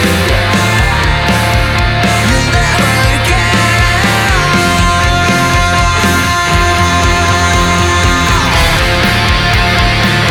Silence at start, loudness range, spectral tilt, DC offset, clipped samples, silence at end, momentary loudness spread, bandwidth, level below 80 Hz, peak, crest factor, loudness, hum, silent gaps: 0 s; 1 LU; -4 dB/octave; under 0.1%; under 0.1%; 0 s; 1 LU; 17.5 kHz; -18 dBFS; 0 dBFS; 10 dB; -9 LUFS; none; none